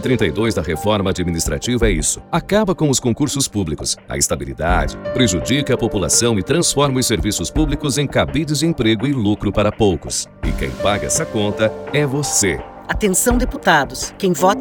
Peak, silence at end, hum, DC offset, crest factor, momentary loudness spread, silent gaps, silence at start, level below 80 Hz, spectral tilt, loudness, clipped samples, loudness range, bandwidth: 0 dBFS; 0 s; none; under 0.1%; 18 dB; 6 LU; none; 0 s; -30 dBFS; -4 dB/octave; -17 LUFS; under 0.1%; 2 LU; over 20 kHz